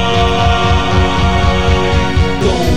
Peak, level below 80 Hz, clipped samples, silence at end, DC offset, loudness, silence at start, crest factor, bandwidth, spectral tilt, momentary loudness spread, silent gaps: 0 dBFS; -18 dBFS; under 0.1%; 0 s; 8%; -12 LUFS; 0 s; 10 dB; 13 kHz; -5.5 dB/octave; 2 LU; none